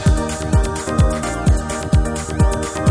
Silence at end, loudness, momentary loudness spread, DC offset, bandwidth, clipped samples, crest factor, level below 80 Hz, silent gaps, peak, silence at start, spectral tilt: 0 s; -19 LUFS; 3 LU; under 0.1%; 10.5 kHz; under 0.1%; 14 dB; -20 dBFS; none; -2 dBFS; 0 s; -6 dB/octave